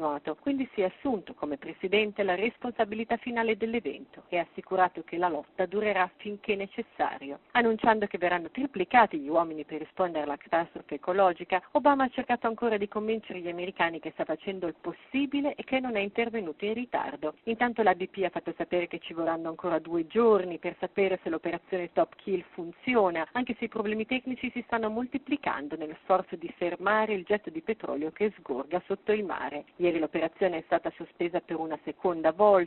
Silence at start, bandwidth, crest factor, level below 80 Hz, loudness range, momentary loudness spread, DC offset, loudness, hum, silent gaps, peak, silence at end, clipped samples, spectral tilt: 0 s; 4.2 kHz; 22 dB; -66 dBFS; 4 LU; 10 LU; under 0.1%; -30 LUFS; none; none; -8 dBFS; 0 s; under 0.1%; -3 dB/octave